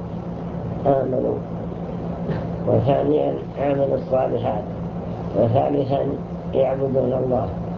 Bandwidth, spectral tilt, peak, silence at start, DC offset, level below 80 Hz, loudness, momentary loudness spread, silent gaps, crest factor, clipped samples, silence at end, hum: 6.6 kHz; -10.5 dB/octave; -4 dBFS; 0 s; under 0.1%; -40 dBFS; -22 LUFS; 10 LU; none; 18 dB; under 0.1%; 0 s; none